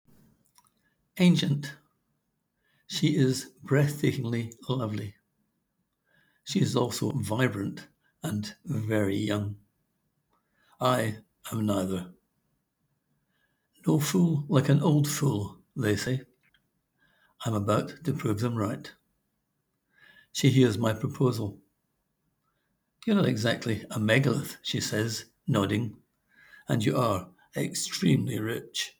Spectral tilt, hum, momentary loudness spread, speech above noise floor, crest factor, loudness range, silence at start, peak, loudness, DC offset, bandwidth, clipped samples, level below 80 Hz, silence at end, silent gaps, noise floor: -5.5 dB/octave; none; 13 LU; 52 dB; 22 dB; 5 LU; 1.15 s; -8 dBFS; -28 LUFS; under 0.1%; over 20 kHz; under 0.1%; -68 dBFS; 0.1 s; none; -78 dBFS